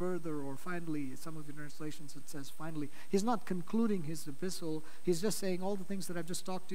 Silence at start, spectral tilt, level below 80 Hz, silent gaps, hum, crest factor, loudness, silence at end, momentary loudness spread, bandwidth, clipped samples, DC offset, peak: 0 s; -5.5 dB/octave; -74 dBFS; none; none; 18 dB; -39 LUFS; 0 s; 13 LU; 16 kHz; under 0.1%; 2%; -18 dBFS